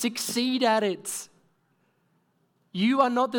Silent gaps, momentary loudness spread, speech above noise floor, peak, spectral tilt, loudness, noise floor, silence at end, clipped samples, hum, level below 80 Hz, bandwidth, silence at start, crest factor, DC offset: none; 14 LU; 45 dB; -8 dBFS; -3.5 dB/octave; -25 LUFS; -70 dBFS; 0 s; under 0.1%; none; -80 dBFS; 19 kHz; 0 s; 18 dB; under 0.1%